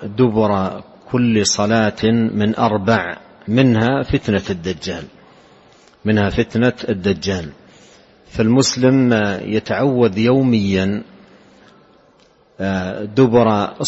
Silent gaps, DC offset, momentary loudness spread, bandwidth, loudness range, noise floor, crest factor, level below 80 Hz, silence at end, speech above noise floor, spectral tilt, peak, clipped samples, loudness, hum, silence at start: none; under 0.1%; 12 LU; 8.4 kHz; 5 LU; -52 dBFS; 16 dB; -44 dBFS; 0 s; 36 dB; -5.5 dB/octave; -2 dBFS; under 0.1%; -17 LUFS; none; 0 s